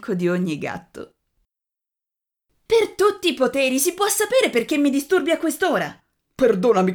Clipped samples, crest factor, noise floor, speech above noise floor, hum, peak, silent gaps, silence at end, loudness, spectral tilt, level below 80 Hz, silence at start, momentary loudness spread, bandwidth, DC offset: under 0.1%; 18 dB; -87 dBFS; 67 dB; none; -4 dBFS; none; 0 s; -20 LUFS; -4 dB/octave; -58 dBFS; 0 s; 11 LU; over 20 kHz; under 0.1%